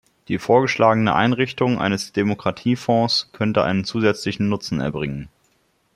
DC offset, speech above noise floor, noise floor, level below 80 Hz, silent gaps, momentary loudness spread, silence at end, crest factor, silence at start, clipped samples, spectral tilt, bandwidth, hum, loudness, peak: under 0.1%; 44 dB; -64 dBFS; -52 dBFS; none; 8 LU; 0.7 s; 18 dB; 0.3 s; under 0.1%; -6 dB/octave; 12.5 kHz; none; -20 LUFS; -2 dBFS